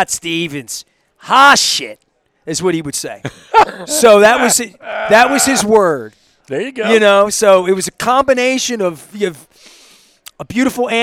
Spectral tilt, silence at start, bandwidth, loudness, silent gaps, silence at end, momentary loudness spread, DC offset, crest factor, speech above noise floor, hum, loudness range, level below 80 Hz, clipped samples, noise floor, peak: -2.5 dB/octave; 0 s; 17.5 kHz; -12 LUFS; none; 0 s; 16 LU; under 0.1%; 14 dB; 34 dB; none; 4 LU; -50 dBFS; 0.2%; -46 dBFS; 0 dBFS